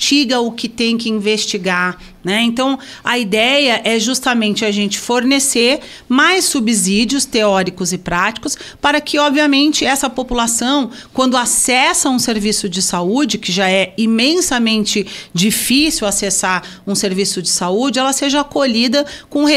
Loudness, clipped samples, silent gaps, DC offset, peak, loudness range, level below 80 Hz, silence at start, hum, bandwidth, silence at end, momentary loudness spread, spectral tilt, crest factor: -14 LUFS; under 0.1%; none; under 0.1%; 0 dBFS; 2 LU; -44 dBFS; 0 s; none; 16 kHz; 0 s; 6 LU; -2.5 dB/octave; 14 dB